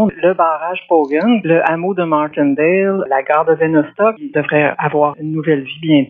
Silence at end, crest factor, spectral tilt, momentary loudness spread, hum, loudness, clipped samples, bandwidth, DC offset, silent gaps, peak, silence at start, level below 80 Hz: 0.05 s; 14 dB; -9.5 dB/octave; 4 LU; none; -15 LUFS; under 0.1%; 4.5 kHz; under 0.1%; none; 0 dBFS; 0 s; -60 dBFS